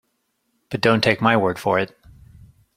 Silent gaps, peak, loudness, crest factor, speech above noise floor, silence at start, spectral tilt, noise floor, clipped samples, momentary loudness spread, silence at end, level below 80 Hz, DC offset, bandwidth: none; -2 dBFS; -19 LUFS; 20 dB; 52 dB; 0.7 s; -6 dB/octave; -71 dBFS; under 0.1%; 11 LU; 0.9 s; -54 dBFS; under 0.1%; 15.5 kHz